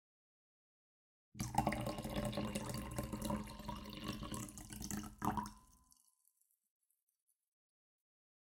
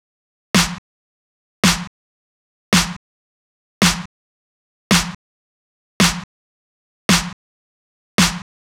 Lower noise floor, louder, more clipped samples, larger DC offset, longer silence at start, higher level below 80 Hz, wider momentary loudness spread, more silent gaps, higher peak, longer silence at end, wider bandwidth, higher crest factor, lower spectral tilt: second, -80 dBFS vs under -90 dBFS; second, -44 LUFS vs -17 LUFS; neither; neither; first, 1.35 s vs 0.55 s; second, -58 dBFS vs -40 dBFS; second, 9 LU vs 15 LU; second, none vs 0.78-1.63 s, 1.87-2.72 s, 2.96-3.81 s, 4.06-4.90 s, 5.15-6.00 s, 6.24-7.09 s, 7.33-8.18 s; second, -18 dBFS vs -4 dBFS; first, 2.65 s vs 0.3 s; second, 16.5 kHz vs 19 kHz; first, 28 dB vs 18 dB; first, -5 dB/octave vs -3 dB/octave